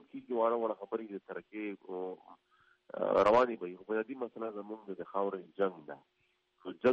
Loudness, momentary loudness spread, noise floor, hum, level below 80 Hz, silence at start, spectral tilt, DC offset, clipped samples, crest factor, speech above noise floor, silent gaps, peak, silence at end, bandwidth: -35 LUFS; 19 LU; -72 dBFS; none; -74 dBFS; 0.15 s; -4 dB/octave; under 0.1%; under 0.1%; 18 dB; 38 dB; none; -16 dBFS; 0 s; 8 kHz